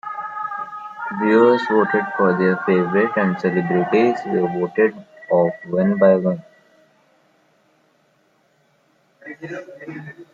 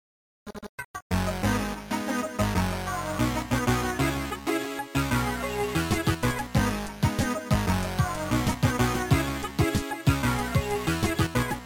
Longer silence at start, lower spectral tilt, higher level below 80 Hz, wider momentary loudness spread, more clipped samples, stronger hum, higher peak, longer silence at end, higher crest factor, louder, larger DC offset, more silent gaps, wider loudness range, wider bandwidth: second, 0.05 s vs 0.45 s; first, -8.5 dB/octave vs -5.5 dB/octave; second, -66 dBFS vs -38 dBFS; first, 18 LU vs 5 LU; neither; neither; first, -2 dBFS vs -10 dBFS; about the same, 0.1 s vs 0 s; about the same, 18 dB vs 18 dB; first, -18 LUFS vs -27 LUFS; neither; second, none vs 0.69-0.78 s, 0.84-0.94 s, 1.02-1.10 s; first, 11 LU vs 2 LU; second, 7.4 kHz vs 17 kHz